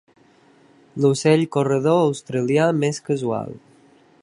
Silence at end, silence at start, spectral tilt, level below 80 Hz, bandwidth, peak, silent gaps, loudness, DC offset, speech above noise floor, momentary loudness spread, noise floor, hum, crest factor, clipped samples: 0.65 s; 0.95 s; -6 dB/octave; -66 dBFS; 11.5 kHz; -4 dBFS; none; -20 LUFS; under 0.1%; 35 dB; 9 LU; -54 dBFS; none; 18 dB; under 0.1%